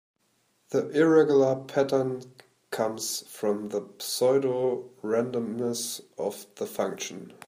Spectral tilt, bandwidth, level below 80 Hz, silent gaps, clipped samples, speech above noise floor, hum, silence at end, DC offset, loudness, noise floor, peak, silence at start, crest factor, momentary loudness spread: -4.5 dB/octave; 15.5 kHz; -76 dBFS; none; under 0.1%; 44 dB; none; 0.15 s; under 0.1%; -27 LUFS; -70 dBFS; -8 dBFS; 0.7 s; 18 dB; 13 LU